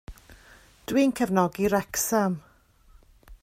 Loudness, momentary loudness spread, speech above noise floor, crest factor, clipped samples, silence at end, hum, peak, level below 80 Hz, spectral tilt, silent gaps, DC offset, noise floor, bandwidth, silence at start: -25 LUFS; 8 LU; 32 dB; 18 dB; under 0.1%; 0.05 s; none; -8 dBFS; -52 dBFS; -5 dB/octave; none; under 0.1%; -57 dBFS; 16 kHz; 0.1 s